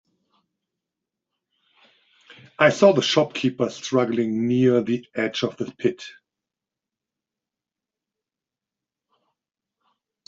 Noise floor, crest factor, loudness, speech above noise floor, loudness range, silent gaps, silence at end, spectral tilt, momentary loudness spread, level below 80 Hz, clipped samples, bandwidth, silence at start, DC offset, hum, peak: -89 dBFS; 22 dB; -21 LUFS; 68 dB; 11 LU; none; 4.15 s; -5 dB/octave; 11 LU; -68 dBFS; under 0.1%; 7.8 kHz; 2.6 s; under 0.1%; none; -2 dBFS